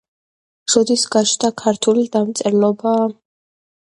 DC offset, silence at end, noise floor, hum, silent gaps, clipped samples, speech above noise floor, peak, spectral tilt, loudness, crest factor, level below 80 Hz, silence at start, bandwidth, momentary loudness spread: under 0.1%; 0.75 s; under -90 dBFS; none; none; under 0.1%; over 74 dB; 0 dBFS; -3.5 dB/octave; -16 LUFS; 18 dB; -62 dBFS; 0.7 s; 11.5 kHz; 4 LU